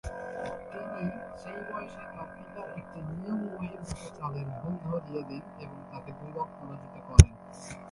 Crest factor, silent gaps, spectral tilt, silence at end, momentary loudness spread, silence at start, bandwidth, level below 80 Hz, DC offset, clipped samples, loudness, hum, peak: 30 dB; none; -6 dB/octave; 0 s; 20 LU; 0.05 s; 11.5 kHz; -34 dBFS; under 0.1%; under 0.1%; -31 LUFS; none; 0 dBFS